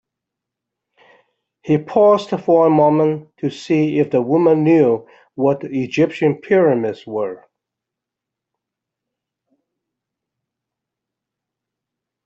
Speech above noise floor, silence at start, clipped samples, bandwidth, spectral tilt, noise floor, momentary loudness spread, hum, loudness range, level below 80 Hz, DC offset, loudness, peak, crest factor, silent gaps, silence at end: 68 dB; 1.65 s; under 0.1%; 7.8 kHz; -8 dB/octave; -84 dBFS; 11 LU; none; 7 LU; -64 dBFS; under 0.1%; -16 LUFS; -2 dBFS; 18 dB; none; 4.9 s